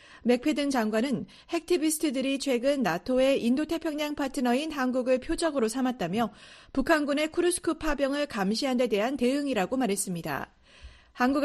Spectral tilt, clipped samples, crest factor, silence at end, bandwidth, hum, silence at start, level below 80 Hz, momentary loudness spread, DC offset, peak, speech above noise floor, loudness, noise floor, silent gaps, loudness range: -4 dB/octave; under 0.1%; 18 dB; 0 s; 13.5 kHz; none; 0.1 s; -50 dBFS; 6 LU; under 0.1%; -10 dBFS; 24 dB; -28 LUFS; -51 dBFS; none; 2 LU